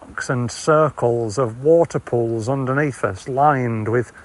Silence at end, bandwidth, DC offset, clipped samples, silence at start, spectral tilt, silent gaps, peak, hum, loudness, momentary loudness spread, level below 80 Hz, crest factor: 0 s; 11.5 kHz; under 0.1%; under 0.1%; 0 s; -6.5 dB/octave; none; -4 dBFS; none; -19 LUFS; 7 LU; -54 dBFS; 16 dB